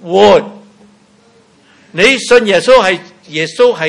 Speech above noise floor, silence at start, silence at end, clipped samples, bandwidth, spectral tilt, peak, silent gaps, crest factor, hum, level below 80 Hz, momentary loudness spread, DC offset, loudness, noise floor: 38 dB; 0.05 s; 0 s; 1%; 12 kHz; -3.5 dB/octave; 0 dBFS; none; 12 dB; none; -46 dBFS; 14 LU; under 0.1%; -9 LUFS; -47 dBFS